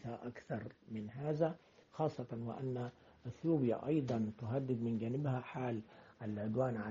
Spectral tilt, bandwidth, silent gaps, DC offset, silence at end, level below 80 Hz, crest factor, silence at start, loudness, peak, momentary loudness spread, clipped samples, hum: -8.5 dB/octave; 7.4 kHz; none; under 0.1%; 0 s; -72 dBFS; 18 dB; 0 s; -40 LUFS; -22 dBFS; 13 LU; under 0.1%; none